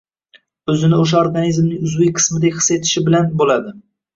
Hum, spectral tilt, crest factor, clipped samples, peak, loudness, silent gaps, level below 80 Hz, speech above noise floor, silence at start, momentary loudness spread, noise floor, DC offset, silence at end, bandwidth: none; -5 dB/octave; 14 dB; under 0.1%; -2 dBFS; -15 LUFS; none; -52 dBFS; 38 dB; 0.65 s; 6 LU; -53 dBFS; under 0.1%; 0.35 s; 7.8 kHz